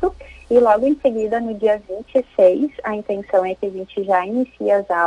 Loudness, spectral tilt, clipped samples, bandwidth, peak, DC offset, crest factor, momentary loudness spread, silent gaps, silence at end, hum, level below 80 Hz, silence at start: -19 LUFS; -7 dB/octave; under 0.1%; 10.5 kHz; -2 dBFS; under 0.1%; 16 dB; 10 LU; none; 0 s; none; -48 dBFS; 0 s